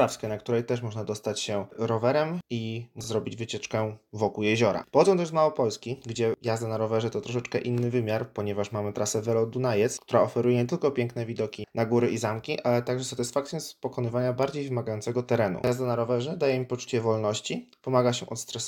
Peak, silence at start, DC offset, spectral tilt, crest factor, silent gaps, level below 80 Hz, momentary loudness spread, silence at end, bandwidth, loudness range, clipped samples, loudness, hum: -6 dBFS; 0 s; under 0.1%; -5.5 dB/octave; 20 dB; none; -66 dBFS; 8 LU; 0 s; 17 kHz; 3 LU; under 0.1%; -28 LUFS; none